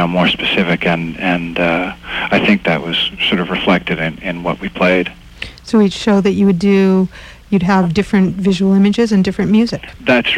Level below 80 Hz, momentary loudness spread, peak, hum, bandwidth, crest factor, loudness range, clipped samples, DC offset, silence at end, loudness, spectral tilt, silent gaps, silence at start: -40 dBFS; 9 LU; 0 dBFS; none; 9.8 kHz; 14 dB; 2 LU; under 0.1%; under 0.1%; 0 s; -14 LUFS; -6.5 dB/octave; none; 0 s